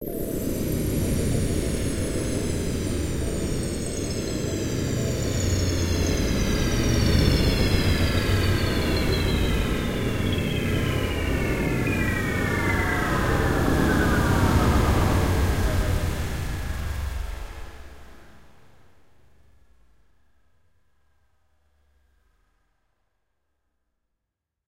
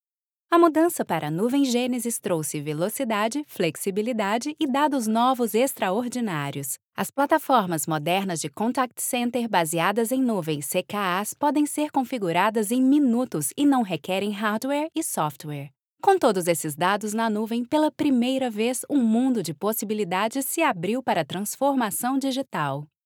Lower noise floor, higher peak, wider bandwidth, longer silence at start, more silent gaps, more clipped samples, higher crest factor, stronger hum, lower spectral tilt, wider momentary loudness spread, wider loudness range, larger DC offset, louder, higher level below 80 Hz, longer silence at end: second, -83 dBFS vs -88 dBFS; about the same, -6 dBFS vs -6 dBFS; second, 16 kHz vs 19.5 kHz; second, 0 s vs 0.5 s; second, none vs 6.85-6.92 s, 15.78-15.97 s; neither; about the same, 18 dB vs 18 dB; neither; about the same, -5.5 dB/octave vs -4.5 dB/octave; about the same, 8 LU vs 7 LU; first, 8 LU vs 2 LU; neither; about the same, -24 LUFS vs -24 LUFS; first, -30 dBFS vs -78 dBFS; first, 6.15 s vs 0.2 s